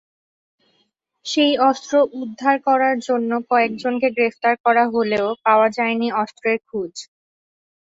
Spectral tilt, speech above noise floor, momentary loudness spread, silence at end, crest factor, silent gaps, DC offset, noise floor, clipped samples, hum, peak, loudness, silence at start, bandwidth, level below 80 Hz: -4 dB/octave; 49 dB; 8 LU; 0.8 s; 16 dB; 4.60-4.64 s; under 0.1%; -67 dBFS; under 0.1%; none; -4 dBFS; -19 LUFS; 1.25 s; 8 kHz; -66 dBFS